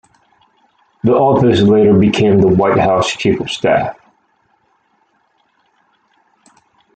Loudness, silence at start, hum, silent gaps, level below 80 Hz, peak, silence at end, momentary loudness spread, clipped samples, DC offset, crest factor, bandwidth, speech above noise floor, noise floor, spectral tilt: -12 LUFS; 1.05 s; none; none; -46 dBFS; 0 dBFS; 3.05 s; 7 LU; under 0.1%; under 0.1%; 14 dB; 9 kHz; 48 dB; -60 dBFS; -6.5 dB/octave